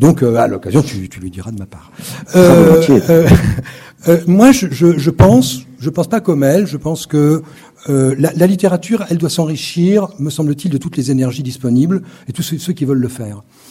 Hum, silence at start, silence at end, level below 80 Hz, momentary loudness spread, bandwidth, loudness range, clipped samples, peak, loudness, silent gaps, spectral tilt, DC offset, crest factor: none; 0 s; 0.3 s; -36 dBFS; 19 LU; 16.5 kHz; 7 LU; 0.9%; 0 dBFS; -12 LUFS; none; -6.5 dB/octave; under 0.1%; 12 dB